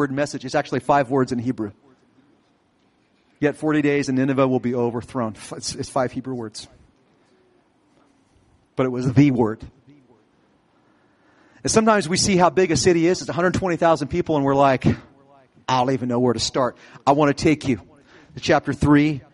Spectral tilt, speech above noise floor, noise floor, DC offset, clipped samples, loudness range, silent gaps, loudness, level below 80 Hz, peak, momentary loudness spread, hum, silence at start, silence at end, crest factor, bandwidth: -5.5 dB/octave; 42 dB; -62 dBFS; under 0.1%; under 0.1%; 9 LU; none; -20 LUFS; -50 dBFS; -4 dBFS; 12 LU; none; 0 s; 0.15 s; 18 dB; 11.5 kHz